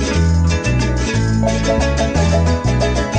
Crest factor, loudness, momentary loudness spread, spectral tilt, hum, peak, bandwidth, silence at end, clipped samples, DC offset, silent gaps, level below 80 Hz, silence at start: 10 dB; -16 LUFS; 2 LU; -6 dB/octave; none; -4 dBFS; 9.4 kHz; 0 s; under 0.1%; under 0.1%; none; -20 dBFS; 0 s